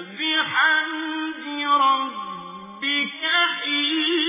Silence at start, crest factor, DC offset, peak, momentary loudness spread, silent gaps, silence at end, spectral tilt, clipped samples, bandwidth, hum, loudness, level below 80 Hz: 0 s; 16 dB; under 0.1%; -8 dBFS; 12 LU; none; 0 s; -5.5 dB/octave; under 0.1%; 3.9 kHz; none; -21 LUFS; -74 dBFS